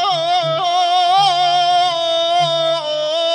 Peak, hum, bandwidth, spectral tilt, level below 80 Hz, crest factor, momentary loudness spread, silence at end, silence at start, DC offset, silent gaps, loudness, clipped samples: -4 dBFS; none; 10.5 kHz; -2.5 dB/octave; -72 dBFS; 12 dB; 5 LU; 0 s; 0 s; under 0.1%; none; -15 LUFS; under 0.1%